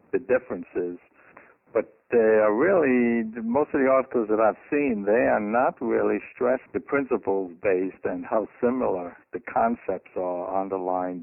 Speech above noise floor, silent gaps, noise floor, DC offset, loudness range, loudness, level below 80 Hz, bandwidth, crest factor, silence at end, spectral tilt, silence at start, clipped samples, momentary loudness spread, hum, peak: 29 dB; none; -53 dBFS; under 0.1%; 5 LU; -25 LUFS; -62 dBFS; 3 kHz; 16 dB; 0 s; -7.5 dB/octave; 0.15 s; under 0.1%; 10 LU; none; -8 dBFS